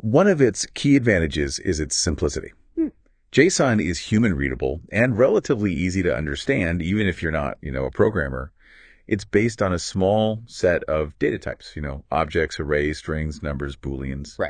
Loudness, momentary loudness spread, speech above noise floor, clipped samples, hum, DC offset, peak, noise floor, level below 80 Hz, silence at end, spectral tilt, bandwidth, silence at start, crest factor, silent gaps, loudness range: -22 LUFS; 12 LU; 29 dB; under 0.1%; none; under 0.1%; -2 dBFS; -51 dBFS; -38 dBFS; 0 s; -5.5 dB/octave; 10 kHz; 0 s; 20 dB; none; 4 LU